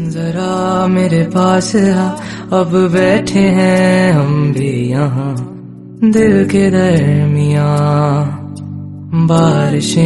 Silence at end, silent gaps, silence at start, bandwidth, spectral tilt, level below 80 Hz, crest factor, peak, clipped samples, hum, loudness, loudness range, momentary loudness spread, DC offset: 0 s; none; 0 s; 11.5 kHz; -7 dB/octave; -44 dBFS; 12 dB; 0 dBFS; under 0.1%; none; -12 LUFS; 1 LU; 12 LU; under 0.1%